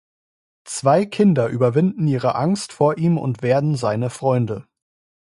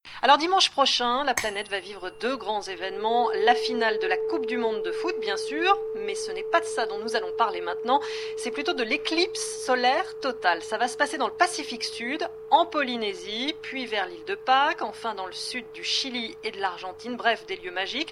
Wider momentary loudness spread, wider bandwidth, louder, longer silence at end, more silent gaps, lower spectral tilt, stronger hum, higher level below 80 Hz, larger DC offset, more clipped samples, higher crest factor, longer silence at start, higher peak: second, 5 LU vs 10 LU; second, 11.5 kHz vs 16 kHz; first, -19 LUFS vs -26 LUFS; first, 0.6 s vs 0 s; neither; first, -7 dB/octave vs -1.5 dB/octave; neither; first, -58 dBFS vs -64 dBFS; neither; neither; second, 16 dB vs 22 dB; first, 0.65 s vs 0.05 s; about the same, -4 dBFS vs -6 dBFS